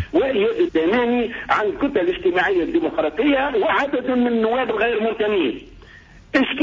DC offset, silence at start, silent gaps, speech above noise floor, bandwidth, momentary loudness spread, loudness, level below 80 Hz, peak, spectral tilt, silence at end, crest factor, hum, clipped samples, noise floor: under 0.1%; 0 s; none; 26 dB; 7.6 kHz; 3 LU; -19 LUFS; -46 dBFS; -6 dBFS; -6 dB/octave; 0 s; 14 dB; none; under 0.1%; -45 dBFS